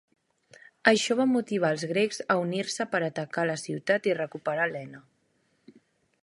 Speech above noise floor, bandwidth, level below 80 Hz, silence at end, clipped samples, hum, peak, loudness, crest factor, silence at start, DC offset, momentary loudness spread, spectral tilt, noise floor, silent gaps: 44 dB; 11.5 kHz; -76 dBFS; 1.2 s; under 0.1%; none; -4 dBFS; -27 LUFS; 24 dB; 0.85 s; under 0.1%; 7 LU; -4.5 dB/octave; -71 dBFS; none